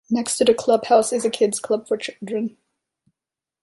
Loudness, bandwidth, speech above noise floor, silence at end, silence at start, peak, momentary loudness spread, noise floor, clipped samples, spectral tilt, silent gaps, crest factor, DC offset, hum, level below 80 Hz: -21 LUFS; 11.5 kHz; 69 dB; 1.15 s; 0.1 s; -2 dBFS; 10 LU; -89 dBFS; under 0.1%; -3.5 dB/octave; none; 18 dB; under 0.1%; none; -64 dBFS